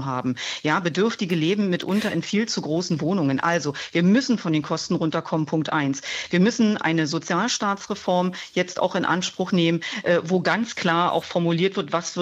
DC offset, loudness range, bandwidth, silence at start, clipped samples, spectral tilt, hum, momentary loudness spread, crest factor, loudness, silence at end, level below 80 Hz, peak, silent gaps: under 0.1%; 1 LU; 12 kHz; 0 s; under 0.1%; -5 dB/octave; none; 5 LU; 16 dB; -23 LUFS; 0 s; -66 dBFS; -6 dBFS; none